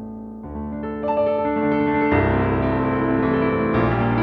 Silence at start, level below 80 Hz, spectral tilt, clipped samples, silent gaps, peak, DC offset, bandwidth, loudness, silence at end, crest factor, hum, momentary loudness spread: 0 s; -36 dBFS; -10.5 dB/octave; under 0.1%; none; -6 dBFS; under 0.1%; 5.4 kHz; -20 LUFS; 0 s; 14 dB; none; 12 LU